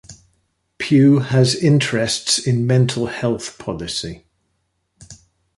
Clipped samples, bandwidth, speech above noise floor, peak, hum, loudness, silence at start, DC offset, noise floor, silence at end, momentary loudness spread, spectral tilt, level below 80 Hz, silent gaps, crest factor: under 0.1%; 11.5 kHz; 53 dB; -2 dBFS; none; -17 LUFS; 0.1 s; under 0.1%; -69 dBFS; 0.45 s; 13 LU; -5 dB/octave; -50 dBFS; none; 16 dB